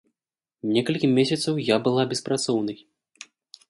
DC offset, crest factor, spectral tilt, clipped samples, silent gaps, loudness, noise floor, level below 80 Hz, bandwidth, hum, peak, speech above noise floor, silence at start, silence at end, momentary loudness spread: under 0.1%; 18 dB; -5 dB/octave; under 0.1%; none; -24 LUFS; -90 dBFS; -66 dBFS; 11.5 kHz; none; -6 dBFS; 67 dB; 0.65 s; 0.95 s; 12 LU